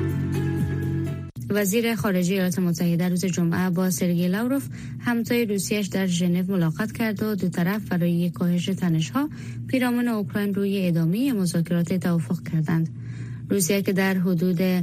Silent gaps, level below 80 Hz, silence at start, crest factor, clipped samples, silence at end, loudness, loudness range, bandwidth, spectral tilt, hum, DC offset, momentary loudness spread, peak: none; -54 dBFS; 0 s; 14 dB; under 0.1%; 0 s; -24 LUFS; 1 LU; 15.5 kHz; -6 dB/octave; none; under 0.1%; 5 LU; -10 dBFS